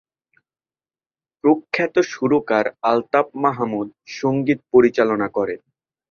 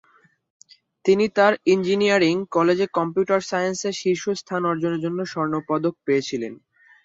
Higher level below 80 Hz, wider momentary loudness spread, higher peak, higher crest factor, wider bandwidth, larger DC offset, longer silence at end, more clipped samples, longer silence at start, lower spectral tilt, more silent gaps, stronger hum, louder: about the same, -62 dBFS vs -66 dBFS; about the same, 9 LU vs 8 LU; about the same, -2 dBFS vs -4 dBFS; about the same, 18 dB vs 18 dB; second, 7 kHz vs 7.8 kHz; neither; about the same, 0.55 s vs 0.5 s; neither; first, 1.45 s vs 1.05 s; first, -6.5 dB/octave vs -5 dB/octave; neither; neither; first, -19 LUFS vs -22 LUFS